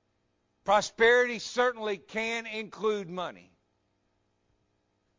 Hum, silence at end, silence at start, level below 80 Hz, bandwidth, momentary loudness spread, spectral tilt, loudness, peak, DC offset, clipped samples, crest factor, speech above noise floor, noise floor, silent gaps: none; 1.8 s; 0.65 s; -68 dBFS; 7.6 kHz; 15 LU; -3 dB/octave; -28 LUFS; -10 dBFS; under 0.1%; under 0.1%; 20 dB; 47 dB; -75 dBFS; none